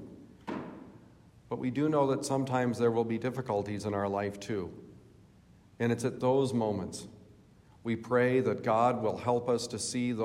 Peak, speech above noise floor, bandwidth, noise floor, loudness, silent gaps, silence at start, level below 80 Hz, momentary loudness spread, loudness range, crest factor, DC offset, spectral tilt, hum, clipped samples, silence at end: -14 dBFS; 29 dB; 15.5 kHz; -59 dBFS; -31 LUFS; none; 0 s; -68 dBFS; 15 LU; 4 LU; 18 dB; under 0.1%; -6 dB/octave; none; under 0.1%; 0 s